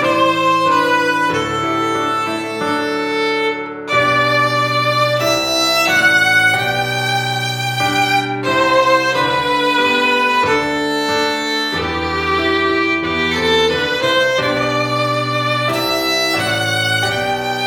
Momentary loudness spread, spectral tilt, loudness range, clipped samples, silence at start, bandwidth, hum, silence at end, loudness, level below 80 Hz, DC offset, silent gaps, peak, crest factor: 6 LU; -3.5 dB/octave; 3 LU; under 0.1%; 0 s; 19 kHz; none; 0 s; -15 LUFS; -46 dBFS; under 0.1%; none; -2 dBFS; 14 dB